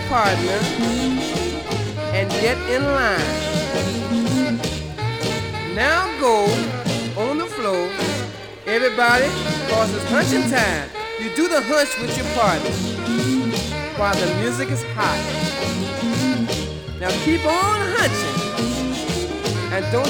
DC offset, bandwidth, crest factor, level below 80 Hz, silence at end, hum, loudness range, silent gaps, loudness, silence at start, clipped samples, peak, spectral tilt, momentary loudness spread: under 0.1%; 19.5 kHz; 18 dB; -40 dBFS; 0 s; none; 2 LU; none; -20 LUFS; 0 s; under 0.1%; -2 dBFS; -4.5 dB/octave; 6 LU